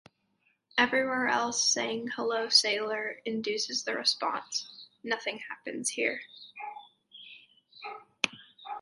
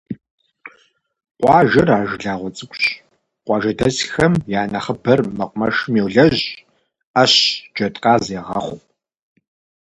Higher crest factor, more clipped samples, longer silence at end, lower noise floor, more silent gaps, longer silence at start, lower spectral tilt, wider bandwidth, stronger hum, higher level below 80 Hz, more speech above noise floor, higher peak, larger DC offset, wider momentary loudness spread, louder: first, 26 dB vs 18 dB; neither; second, 0 s vs 1.05 s; first, -73 dBFS vs -57 dBFS; second, none vs 0.30-0.38 s, 1.31-1.35 s, 7.05-7.14 s; first, 0.75 s vs 0.1 s; second, -0.5 dB/octave vs -5 dB/octave; about the same, 11.5 kHz vs 11.5 kHz; neither; second, -78 dBFS vs -48 dBFS; about the same, 43 dB vs 40 dB; second, -6 dBFS vs 0 dBFS; neither; first, 20 LU vs 16 LU; second, -29 LUFS vs -17 LUFS